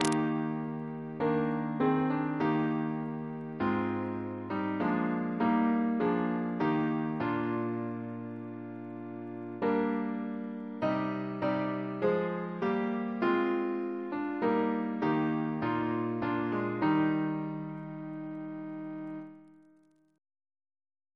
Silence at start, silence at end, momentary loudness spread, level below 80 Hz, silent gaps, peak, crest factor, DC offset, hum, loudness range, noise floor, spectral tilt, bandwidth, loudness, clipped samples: 0 s; 1.65 s; 11 LU; -70 dBFS; none; -10 dBFS; 22 dB; under 0.1%; none; 4 LU; -65 dBFS; -7 dB/octave; 11 kHz; -32 LUFS; under 0.1%